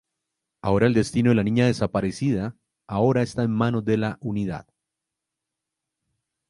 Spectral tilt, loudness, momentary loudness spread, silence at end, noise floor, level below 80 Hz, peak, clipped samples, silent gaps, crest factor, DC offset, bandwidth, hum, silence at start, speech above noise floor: -7 dB/octave; -23 LUFS; 11 LU; 1.9 s; -85 dBFS; -50 dBFS; -6 dBFS; under 0.1%; none; 20 dB; under 0.1%; 11.5 kHz; none; 0.65 s; 63 dB